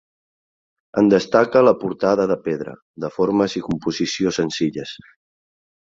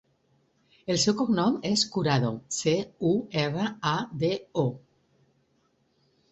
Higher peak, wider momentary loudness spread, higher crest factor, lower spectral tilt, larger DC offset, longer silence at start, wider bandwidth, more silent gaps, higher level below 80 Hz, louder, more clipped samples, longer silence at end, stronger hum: first, -2 dBFS vs -10 dBFS; first, 15 LU vs 5 LU; about the same, 18 dB vs 18 dB; about the same, -5.5 dB/octave vs -4.5 dB/octave; neither; about the same, 0.95 s vs 0.85 s; about the same, 7.8 kHz vs 8.4 kHz; first, 2.82-2.94 s vs none; first, -56 dBFS vs -64 dBFS; first, -19 LUFS vs -27 LUFS; neither; second, 0.9 s vs 1.55 s; neither